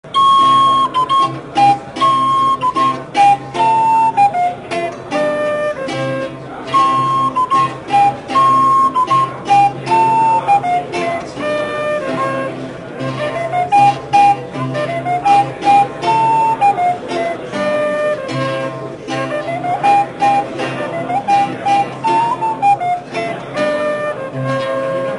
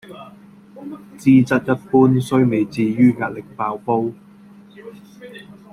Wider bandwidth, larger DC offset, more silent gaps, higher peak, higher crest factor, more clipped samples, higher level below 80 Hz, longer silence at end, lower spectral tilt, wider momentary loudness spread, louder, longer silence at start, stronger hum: second, 11 kHz vs 12.5 kHz; neither; neither; about the same, 0 dBFS vs -2 dBFS; about the same, 14 dB vs 18 dB; neither; about the same, -52 dBFS vs -56 dBFS; second, 0 s vs 0.3 s; second, -5 dB/octave vs -8 dB/octave; second, 10 LU vs 24 LU; about the same, -15 LUFS vs -17 LUFS; about the same, 0.05 s vs 0.1 s; neither